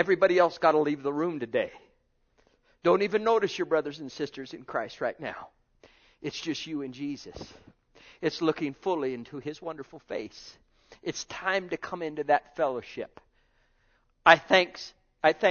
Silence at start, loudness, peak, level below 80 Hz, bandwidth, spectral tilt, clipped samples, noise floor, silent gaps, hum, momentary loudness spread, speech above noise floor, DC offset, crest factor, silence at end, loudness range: 0 s; -28 LUFS; -2 dBFS; -66 dBFS; 7 kHz; -4.5 dB/octave; under 0.1%; -69 dBFS; none; none; 18 LU; 41 dB; under 0.1%; 28 dB; 0 s; 9 LU